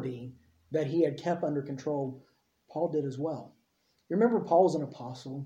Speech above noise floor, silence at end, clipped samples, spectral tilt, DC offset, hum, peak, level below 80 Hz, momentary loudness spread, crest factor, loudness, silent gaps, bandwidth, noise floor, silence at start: 44 dB; 0 s; under 0.1%; -8 dB/octave; under 0.1%; none; -12 dBFS; -74 dBFS; 17 LU; 20 dB; -30 LUFS; none; 9.8 kHz; -73 dBFS; 0 s